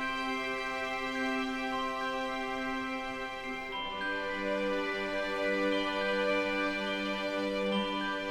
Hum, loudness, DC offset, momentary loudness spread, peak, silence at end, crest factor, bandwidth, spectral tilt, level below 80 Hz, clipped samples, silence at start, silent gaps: none; -33 LUFS; under 0.1%; 6 LU; -20 dBFS; 0 s; 14 dB; 16 kHz; -4.5 dB/octave; -56 dBFS; under 0.1%; 0 s; none